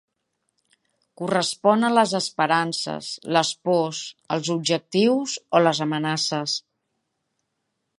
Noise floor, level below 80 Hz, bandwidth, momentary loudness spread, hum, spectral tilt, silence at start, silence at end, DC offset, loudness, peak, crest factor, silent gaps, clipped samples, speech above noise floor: -77 dBFS; -74 dBFS; 11.5 kHz; 9 LU; none; -4 dB/octave; 1.2 s; 1.4 s; under 0.1%; -22 LUFS; -2 dBFS; 22 dB; none; under 0.1%; 55 dB